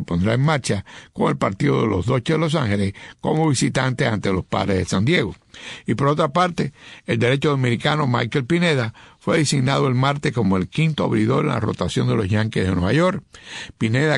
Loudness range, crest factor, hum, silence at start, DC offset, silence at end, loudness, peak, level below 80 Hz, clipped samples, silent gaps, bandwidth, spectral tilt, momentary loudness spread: 1 LU; 16 dB; none; 0 s; under 0.1%; 0 s; -20 LUFS; -4 dBFS; -48 dBFS; under 0.1%; none; 11 kHz; -6 dB/octave; 9 LU